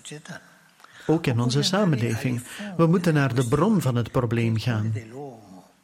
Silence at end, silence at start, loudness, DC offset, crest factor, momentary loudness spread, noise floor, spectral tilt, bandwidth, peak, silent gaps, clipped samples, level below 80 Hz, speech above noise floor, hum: 0.25 s; 0.05 s; -23 LUFS; under 0.1%; 16 dB; 18 LU; -50 dBFS; -6 dB/octave; 16 kHz; -8 dBFS; none; under 0.1%; -54 dBFS; 27 dB; none